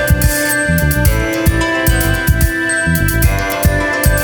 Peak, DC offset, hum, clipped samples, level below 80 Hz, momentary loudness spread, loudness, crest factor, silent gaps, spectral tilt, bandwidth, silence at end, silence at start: 0 dBFS; under 0.1%; none; under 0.1%; -18 dBFS; 2 LU; -13 LUFS; 12 dB; none; -4.5 dB/octave; over 20 kHz; 0 s; 0 s